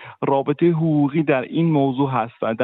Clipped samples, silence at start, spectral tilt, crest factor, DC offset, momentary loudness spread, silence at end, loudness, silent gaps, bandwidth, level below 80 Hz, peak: under 0.1%; 0 s; -7 dB/octave; 14 dB; under 0.1%; 4 LU; 0 s; -20 LUFS; none; 4 kHz; -64 dBFS; -6 dBFS